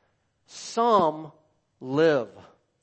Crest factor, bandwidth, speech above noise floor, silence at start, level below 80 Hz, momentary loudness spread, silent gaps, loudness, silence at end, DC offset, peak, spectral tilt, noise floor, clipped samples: 20 dB; 8.6 kHz; 45 dB; 0.55 s; -72 dBFS; 22 LU; none; -24 LUFS; 0.55 s; under 0.1%; -8 dBFS; -5 dB/octave; -68 dBFS; under 0.1%